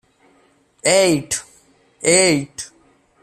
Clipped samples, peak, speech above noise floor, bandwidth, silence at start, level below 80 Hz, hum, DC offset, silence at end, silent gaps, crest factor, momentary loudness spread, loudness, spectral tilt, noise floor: under 0.1%; -2 dBFS; 41 dB; 14.5 kHz; 0.85 s; -56 dBFS; none; under 0.1%; 0.55 s; none; 18 dB; 18 LU; -16 LUFS; -3 dB/octave; -57 dBFS